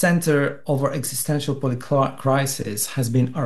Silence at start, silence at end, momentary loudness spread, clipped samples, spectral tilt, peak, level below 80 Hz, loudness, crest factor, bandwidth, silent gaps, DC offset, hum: 0 s; 0 s; 5 LU; under 0.1%; -5.5 dB/octave; -6 dBFS; -58 dBFS; -22 LUFS; 16 dB; 13 kHz; none; 1%; none